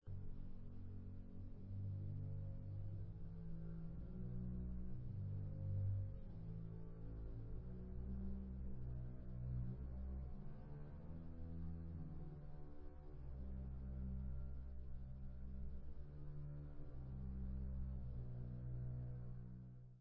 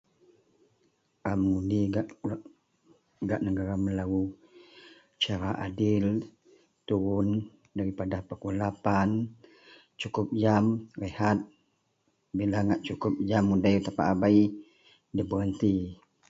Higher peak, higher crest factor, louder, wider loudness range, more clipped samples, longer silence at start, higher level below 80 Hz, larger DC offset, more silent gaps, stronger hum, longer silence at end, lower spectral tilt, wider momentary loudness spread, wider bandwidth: second, -34 dBFS vs -10 dBFS; second, 14 dB vs 20 dB; second, -52 LUFS vs -29 LUFS; about the same, 5 LU vs 5 LU; neither; second, 0 s vs 1.25 s; about the same, -52 dBFS vs -52 dBFS; neither; neither; neither; second, 0 s vs 0.35 s; first, -11.5 dB/octave vs -7.5 dB/octave; second, 8 LU vs 12 LU; second, 2.8 kHz vs 7.8 kHz